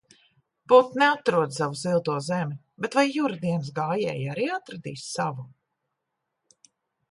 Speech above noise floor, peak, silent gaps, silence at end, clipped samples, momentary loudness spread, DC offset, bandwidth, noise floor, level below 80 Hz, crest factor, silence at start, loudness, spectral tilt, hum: 57 dB; -6 dBFS; none; 1.65 s; under 0.1%; 14 LU; under 0.1%; 11.5 kHz; -82 dBFS; -72 dBFS; 22 dB; 0.7 s; -25 LUFS; -5.5 dB/octave; none